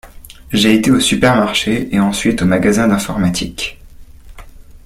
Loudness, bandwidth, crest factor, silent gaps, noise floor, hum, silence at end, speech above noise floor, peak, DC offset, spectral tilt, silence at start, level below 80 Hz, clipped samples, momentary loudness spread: -14 LUFS; 16 kHz; 14 dB; none; -36 dBFS; none; 0.1 s; 23 dB; 0 dBFS; under 0.1%; -4.5 dB/octave; 0.05 s; -36 dBFS; under 0.1%; 9 LU